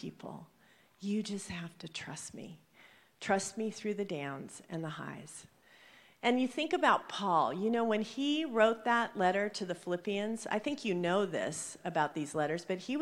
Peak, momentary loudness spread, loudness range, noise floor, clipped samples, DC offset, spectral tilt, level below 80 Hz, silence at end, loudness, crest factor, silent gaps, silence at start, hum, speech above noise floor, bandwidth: -12 dBFS; 15 LU; 8 LU; -62 dBFS; under 0.1%; under 0.1%; -4.5 dB/octave; -76 dBFS; 0 s; -34 LUFS; 22 dB; none; 0 s; none; 28 dB; 15.5 kHz